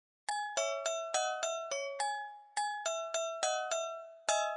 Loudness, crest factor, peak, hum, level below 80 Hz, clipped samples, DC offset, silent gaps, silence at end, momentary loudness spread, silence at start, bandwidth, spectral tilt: -36 LUFS; 20 dB; -16 dBFS; none; under -90 dBFS; under 0.1%; under 0.1%; none; 0 s; 5 LU; 0.3 s; 11.5 kHz; 3 dB/octave